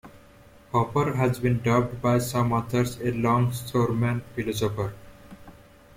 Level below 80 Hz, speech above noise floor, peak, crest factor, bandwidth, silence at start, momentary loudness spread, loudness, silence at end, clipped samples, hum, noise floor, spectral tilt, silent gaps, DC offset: -50 dBFS; 27 dB; -8 dBFS; 18 dB; 16 kHz; 0.05 s; 5 LU; -25 LUFS; 0.45 s; under 0.1%; none; -52 dBFS; -6.5 dB/octave; none; under 0.1%